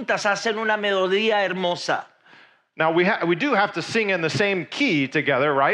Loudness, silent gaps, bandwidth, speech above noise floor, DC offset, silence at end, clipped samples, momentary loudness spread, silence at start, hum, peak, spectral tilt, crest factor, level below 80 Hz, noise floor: -21 LUFS; none; 11 kHz; 31 dB; under 0.1%; 0 s; under 0.1%; 4 LU; 0 s; none; -6 dBFS; -4.5 dB/octave; 16 dB; -72 dBFS; -53 dBFS